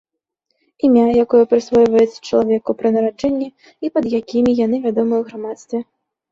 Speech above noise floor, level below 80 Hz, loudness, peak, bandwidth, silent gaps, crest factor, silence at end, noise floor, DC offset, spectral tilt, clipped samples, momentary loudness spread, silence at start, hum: 57 dB; -54 dBFS; -16 LUFS; -2 dBFS; 7.6 kHz; none; 14 dB; 0.5 s; -73 dBFS; under 0.1%; -7 dB/octave; under 0.1%; 13 LU; 0.85 s; none